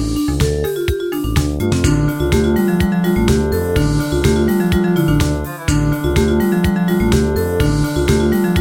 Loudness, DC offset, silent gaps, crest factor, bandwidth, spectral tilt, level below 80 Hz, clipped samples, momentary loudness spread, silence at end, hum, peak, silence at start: -16 LUFS; under 0.1%; none; 14 dB; 17 kHz; -6.5 dB/octave; -24 dBFS; under 0.1%; 4 LU; 0 s; none; 0 dBFS; 0 s